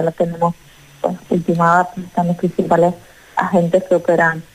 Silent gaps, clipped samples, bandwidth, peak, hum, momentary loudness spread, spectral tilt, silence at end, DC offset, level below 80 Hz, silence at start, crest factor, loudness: none; under 0.1%; 14.5 kHz; -2 dBFS; none; 10 LU; -7.5 dB/octave; 0.1 s; under 0.1%; -52 dBFS; 0 s; 14 dB; -17 LUFS